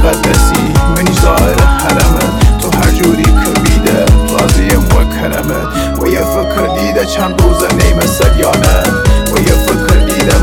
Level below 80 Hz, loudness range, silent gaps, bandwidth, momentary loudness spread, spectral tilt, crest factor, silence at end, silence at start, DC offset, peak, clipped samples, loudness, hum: -12 dBFS; 2 LU; none; 18.5 kHz; 4 LU; -5 dB/octave; 8 dB; 0 s; 0 s; under 0.1%; 0 dBFS; 0.1%; -10 LUFS; none